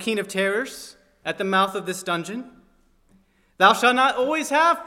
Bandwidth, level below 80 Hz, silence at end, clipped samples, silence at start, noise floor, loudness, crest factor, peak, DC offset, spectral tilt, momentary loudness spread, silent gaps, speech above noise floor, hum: 16.5 kHz; -64 dBFS; 0 s; under 0.1%; 0 s; -60 dBFS; -21 LUFS; 22 dB; -2 dBFS; under 0.1%; -3.5 dB/octave; 16 LU; none; 38 dB; none